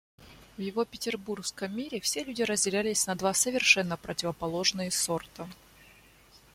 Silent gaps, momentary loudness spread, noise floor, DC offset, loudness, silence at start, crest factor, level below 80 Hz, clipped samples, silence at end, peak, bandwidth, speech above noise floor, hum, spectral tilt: none; 12 LU; -58 dBFS; under 0.1%; -28 LUFS; 0.2 s; 24 dB; -62 dBFS; under 0.1%; 0.15 s; -8 dBFS; 16.5 kHz; 28 dB; none; -2 dB/octave